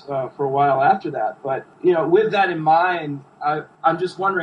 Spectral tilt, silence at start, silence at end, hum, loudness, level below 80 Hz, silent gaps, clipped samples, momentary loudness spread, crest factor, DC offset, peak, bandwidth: -7.5 dB/octave; 0.05 s; 0 s; none; -20 LUFS; -68 dBFS; none; under 0.1%; 10 LU; 16 dB; under 0.1%; -4 dBFS; 9.6 kHz